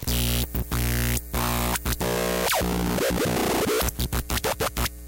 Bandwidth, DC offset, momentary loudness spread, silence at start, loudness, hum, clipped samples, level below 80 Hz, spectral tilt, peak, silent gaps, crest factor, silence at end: 17.5 kHz; under 0.1%; 3 LU; 0 s; -25 LUFS; 60 Hz at -35 dBFS; under 0.1%; -32 dBFS; -4 dB/octave; -12 dBFS; none; 14 dB; 0 s